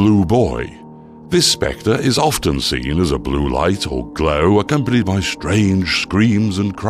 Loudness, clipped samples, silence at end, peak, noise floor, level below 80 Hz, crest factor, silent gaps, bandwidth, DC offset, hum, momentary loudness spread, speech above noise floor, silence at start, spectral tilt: -16 LUFS; under 0.1%; 0 s; -2 dBFS; -37 dBFS; -32 dBFS; 14 dB; none; 14.5 kHz; under 0.1%; none; 5 LU; 22 dB; 0 s; -5 dB/octave